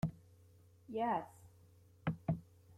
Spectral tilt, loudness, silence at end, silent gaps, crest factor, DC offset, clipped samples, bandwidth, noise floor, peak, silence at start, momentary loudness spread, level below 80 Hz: -8.5 dB/octave; -41 LUFS; 0.05 s; none; 20 dB; under 0.1%; under 0.1%; 13.5 kHz; -65 dBFS; -22 dBFS; 0.05 s; 14 LU; -64 dBFS